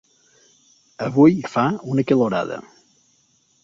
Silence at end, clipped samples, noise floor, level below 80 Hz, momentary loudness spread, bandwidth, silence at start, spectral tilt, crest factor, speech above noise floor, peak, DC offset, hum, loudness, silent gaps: 1 s; under 0.1%; -62 dBFS; -60 dBFS; 14 LU; 7.4 kHz; 1 s; -8 dB/octave; 18 dB; 43 dB; -2 dBFS; under 0.1%; none; -19 LUFS; none